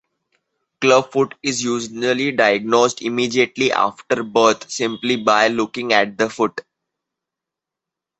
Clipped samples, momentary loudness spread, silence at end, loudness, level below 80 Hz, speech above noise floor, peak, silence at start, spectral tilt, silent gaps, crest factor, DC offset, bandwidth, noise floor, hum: under 0.1%; 7 LU; 1.6 s; -18 LUFS; -62 dBFS; 67 dB; 0 dBFS; 0.8 s; -3.5 dB/octave; none; 18 dB; under 0.1%; 8.4 kHz; -85 dBFS; none